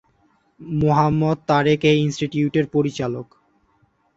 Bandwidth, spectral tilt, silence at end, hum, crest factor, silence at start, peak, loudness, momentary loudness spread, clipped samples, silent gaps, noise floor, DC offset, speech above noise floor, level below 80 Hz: 7.8 kHz; -7 dB/octave; 0.95 s; none; 18 dB; 0.6 s; -2 dBFS; -20 LUFS; 10 LU; under 0.1%; none; -62 dBFS; under 0.1%; 43 dB; -50 dBFS